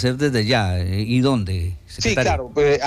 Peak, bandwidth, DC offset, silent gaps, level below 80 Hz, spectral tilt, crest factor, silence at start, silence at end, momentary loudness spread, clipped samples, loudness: -6 dBFS; 14.5 kHz; under 0.1%; none; -36 dBFS; -5.5 dB/octave; 12 dB; 0 s; 0 s; 6 LU; under 0.1%; -20 LUFS